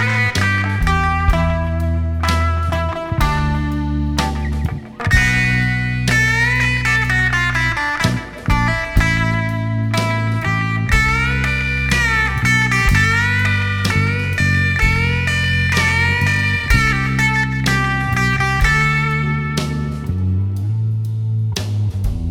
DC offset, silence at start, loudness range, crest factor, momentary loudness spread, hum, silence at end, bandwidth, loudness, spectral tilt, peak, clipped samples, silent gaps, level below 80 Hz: under 0.1%; 0 s; 3 LU; 16 dB; 6 LU; none; 0 s; 17 kHz; -16 LUFS; -5 dB/octave; 0 dBFS; under 0.1%; none; -24 dBFS